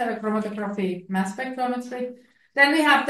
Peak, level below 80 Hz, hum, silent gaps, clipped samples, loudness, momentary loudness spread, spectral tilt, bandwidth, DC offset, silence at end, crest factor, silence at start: -4 dBFS; -74 dBFS; none; none; under 0.1%; -24 LUFS; 14 LU; -4.5 dB/octave; 12.5 kHz; under 0.1%; 0 s; 18 dB; 0 s